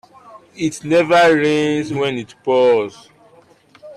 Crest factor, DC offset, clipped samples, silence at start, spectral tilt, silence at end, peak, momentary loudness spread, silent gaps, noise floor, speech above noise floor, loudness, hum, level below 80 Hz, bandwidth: 12 dB; under 0.1%; under 0.1%; 0.35 s; -5 dB/octave; 0.05 s; -4 dBFS; 12 LU; none; -50 dBFS; 34 dB; -16 LUFS; none; -60 dBFS; 12.5 kHz